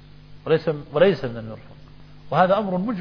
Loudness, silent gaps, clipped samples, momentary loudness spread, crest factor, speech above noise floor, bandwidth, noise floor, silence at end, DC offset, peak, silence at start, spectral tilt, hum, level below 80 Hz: -21 LUFS; none; under 0.1%; 18 LU; 20 dB; 23 dB; 5.4 kHz; -44 dBFS; 0 s; under 0.1%; -4 dBFS; 0.3 s; -8.5 dB/octave; 50 Hz at -50 dBFS; -52 dBFS